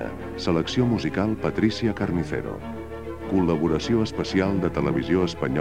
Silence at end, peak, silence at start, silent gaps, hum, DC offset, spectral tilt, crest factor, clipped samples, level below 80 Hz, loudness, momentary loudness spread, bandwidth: 0 s; -8 dBFS; 0 s; none; none; 0.5%; -7 dB/octave; 16 dB; under 0.1%; -42 dBFS; -24 LUFS; 10 LU; 12.5 kHz